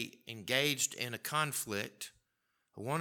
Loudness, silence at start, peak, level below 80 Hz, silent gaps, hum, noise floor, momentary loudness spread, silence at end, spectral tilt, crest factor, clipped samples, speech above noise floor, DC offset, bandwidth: -35 LUFS; 0 s; -14 dBFS; -80 dBFS; none; none; -82 dBFS; 15 LU; 0 s; -2.5 dB/octave; 24 dB; under 0.1%; 45 dB; under 0.1%; 19 kHz